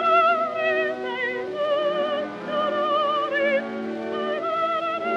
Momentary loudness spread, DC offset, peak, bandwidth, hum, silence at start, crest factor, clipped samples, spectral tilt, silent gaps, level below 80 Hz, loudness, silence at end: 7 LU; under 0.1%; -8 dBFS; 8.4 kHz; none; 0 s; 16 dB; under 0.1%; -5 dB/octave; none; -72 dBFS; -24 LUFS; 0 s